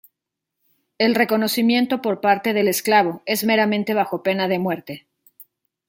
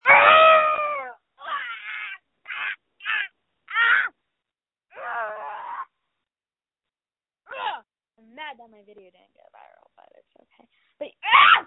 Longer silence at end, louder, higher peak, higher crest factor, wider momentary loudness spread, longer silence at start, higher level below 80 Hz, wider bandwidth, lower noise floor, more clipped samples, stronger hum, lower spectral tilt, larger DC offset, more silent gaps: first, 0.9 s vs 0.05 s; about the same, -19 LUFS vs -20 LUFS; about the same, -2 dBFS vs 0 dBFS; second, 18 dB vs 24 dB; second, 6 LU vs 26 LU; first, 1 s vs 0.05 s; about the same, -70 dBFS vs -70 dBFS; first, 17 kHz vs 4.1 kHz; second, -83 dBFS vs under -90 dBFS; neither; neither; about the same, -4.5 dB/octave vs -5 dB/octave; neither; neither